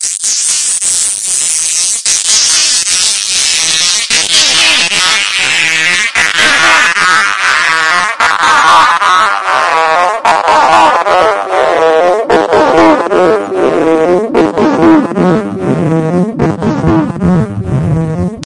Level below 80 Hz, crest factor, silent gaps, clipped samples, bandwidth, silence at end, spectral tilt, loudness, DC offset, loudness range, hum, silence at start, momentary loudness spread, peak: -40 dBFS; 8 dB; none; 1%; 12 kHz; 0 s; -2.5 dB/octave; -8 LUFS; under 0.1%; 4 LU; none; 0 s; 6 LU; 0 dBFS